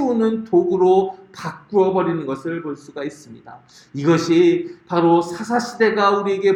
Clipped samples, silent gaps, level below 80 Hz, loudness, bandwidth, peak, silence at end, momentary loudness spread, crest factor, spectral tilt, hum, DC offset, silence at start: under 0.1%; none; -64 dBFS; -18 LUFS; 10 kHz; -4 dBFS; 0 s; 15 LU; 16 dB; -6.5 dB/octave; none; under 0.1%; 0 s